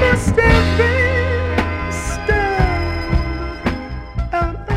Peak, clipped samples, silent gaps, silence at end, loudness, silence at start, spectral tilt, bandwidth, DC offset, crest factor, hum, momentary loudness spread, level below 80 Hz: -2 dBFS; under 0.1%; none; 0 s; -18 LUFS; 0 s; -6 dB/octave; 12.5 kHz; under 0.1%; 14 dB; none; 10 LU; -24 dBFS